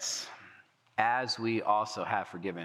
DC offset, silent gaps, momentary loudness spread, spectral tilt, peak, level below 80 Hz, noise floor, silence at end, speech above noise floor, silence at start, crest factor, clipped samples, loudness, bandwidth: under 0.1%; none; 9 LU; -3 dB/octave; -10 dBFS; under -90 dBFS; -60 dBFS; 0 s; 29 dB; 0 s; 22 dB; under 0.1%; -32 LUFS; 14.5 kHz